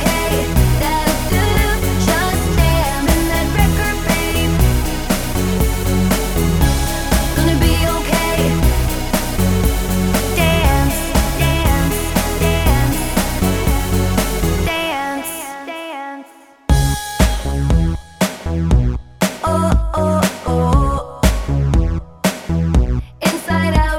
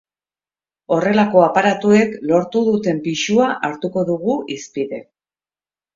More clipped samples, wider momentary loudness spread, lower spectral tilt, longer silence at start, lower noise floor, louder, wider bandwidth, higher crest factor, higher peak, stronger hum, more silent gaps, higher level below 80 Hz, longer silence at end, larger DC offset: neither; second, 5 LU vs 12 LU; about the same, -5 dB/octave vs -5.5 dB/octave; second, 0 s vs 0.9 s; second, -40 dBFS vs under -90 dBFS; about the same, -17 LUFS vs -17 LUFS; first, over 20 kHz vs 7.6 kHz; about the same, 16 dB vs 18 dB; about the same, 0 dBFS vs 0 dBFS; neither; neither; first, -20 dBFS vs -60 dBFS; second, 0 s vs 0.95 s; neither